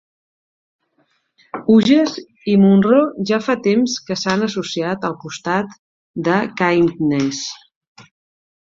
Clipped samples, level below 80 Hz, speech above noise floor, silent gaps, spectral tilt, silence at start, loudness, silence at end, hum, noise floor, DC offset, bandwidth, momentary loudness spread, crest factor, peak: under 0.1%; -58 dBFS; 48 dB; 5.79-6.14 s; -5.5 dB/octave; 1.55 s; -17 LUFS; 1.15 s; none; -64 dBFS; under 0.1%; 7.6 kHz; 15 LU; 16 dB; -2 dBFS